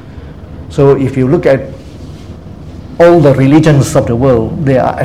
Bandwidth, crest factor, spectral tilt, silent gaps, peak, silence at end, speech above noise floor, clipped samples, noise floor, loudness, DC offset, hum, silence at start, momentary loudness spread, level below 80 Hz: 14 kHz; 10 dB; -7.5 dB/octave; none; 0 dBFS; 0 s; 20 dB; 0.9%; -28 dBFS; -9 LUFS; 0.8%; none; 0.05 s; 23 LU; -32 dBFS